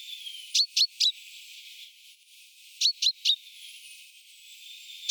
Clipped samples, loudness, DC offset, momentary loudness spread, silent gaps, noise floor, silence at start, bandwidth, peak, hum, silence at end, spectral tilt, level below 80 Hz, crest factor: under 0.1%; -25 LUFS; under 0.1%; 23 LU; none; -55 dBFS; 0 s; over 20 kHz; -12 dBFS; none; 0 s; 13 dB/octave; under -90 dBFS; 20 dB